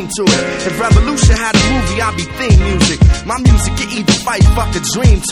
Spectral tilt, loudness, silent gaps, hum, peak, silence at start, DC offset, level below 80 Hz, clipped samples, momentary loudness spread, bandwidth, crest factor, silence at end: -4.5 dB/octave; -12 LUFS; none; none; 0 dBFS; 0 s; under 0.1%; -16 dBFS; 0.3%; 6 LU; 14 kHz; 12 dB; 0 s